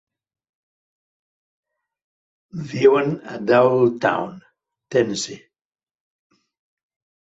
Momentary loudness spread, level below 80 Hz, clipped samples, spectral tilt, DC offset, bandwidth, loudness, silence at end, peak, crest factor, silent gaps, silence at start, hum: 15 LU; -64 dBFS; under 0.1%; -5.5 dB/octave; under 0.1%; 8 kHz; -19 LUFS; 1.85 s; -2 dBFS; 20 dB; none; 2.55 s; none